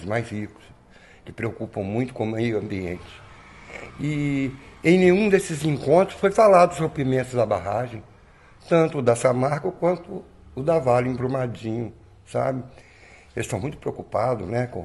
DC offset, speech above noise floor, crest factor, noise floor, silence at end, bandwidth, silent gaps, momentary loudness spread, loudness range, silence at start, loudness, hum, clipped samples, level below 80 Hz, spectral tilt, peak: under 0.1%; 28 dB; 20 dB; -51 dBFS; 0 s; 12 kHz; none; 19 LU; 10 LU; 0 s; -23 LUFS; none; under 0.1%; -52 dBFS; -6.5 dB/octave; -4 dBFS